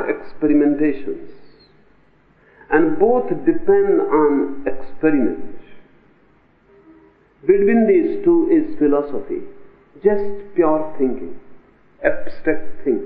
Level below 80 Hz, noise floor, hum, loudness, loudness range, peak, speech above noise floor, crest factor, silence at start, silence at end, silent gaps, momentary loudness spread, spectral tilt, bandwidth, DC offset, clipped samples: -44 dBFS; -55 dBFS; none; -18 LUFS; 5 LU; 0 dBFS; 39 dB; 18 dB; 0 s; 0 s; none; 13 LU; -7.5 dB/octave; 4.9 kHz; under 0.1%; under 0.1%